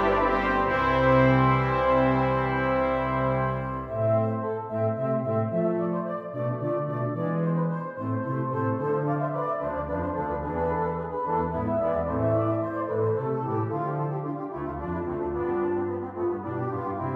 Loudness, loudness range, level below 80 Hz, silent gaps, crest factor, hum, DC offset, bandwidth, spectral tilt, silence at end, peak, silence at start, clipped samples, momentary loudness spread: -26 LUFS; 6 LU; -46 dBFS; none; 18 dB; none; under 0.1%; 6.2 kHz; -9.5 dB/octave; 0 s; -8 dBFS; 0 s; under 0.1%; 8 LU